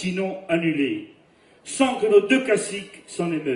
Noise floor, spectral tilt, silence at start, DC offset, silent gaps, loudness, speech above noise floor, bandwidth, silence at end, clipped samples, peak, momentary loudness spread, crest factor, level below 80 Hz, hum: -55 dBFS; -4.5 dB/octave; 0 s; under 0.1%; none; -22 LUFS; 33 dB; 11.5 kHz; 0 s; under 0.1%; -4 dBFS; 16 LU; 18 dB; -66 dBFS; none